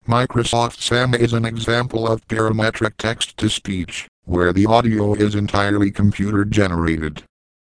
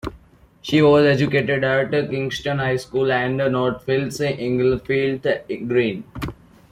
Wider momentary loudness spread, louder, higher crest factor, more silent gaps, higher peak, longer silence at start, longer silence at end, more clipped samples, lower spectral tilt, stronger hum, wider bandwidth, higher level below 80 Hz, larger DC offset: second, 7 LU vs 10 LU; about the same, -19 LUFS vs -20 LUFS; about the same, 18 dB vs 16 dB; first, 4.08-4.22 s vs none; first, 0 dBFS vs -4 dBFS; about the same, 0.1 s vs 0.05 s; about the same, 0.4 s vs 0.4 s; neither; about the same, -5.5 dB/octave vs -6.5 dB/octave; neither; second, 10.5 kHz vs 15 kHz; first, -38 dBFS vs -48 dBFS; neither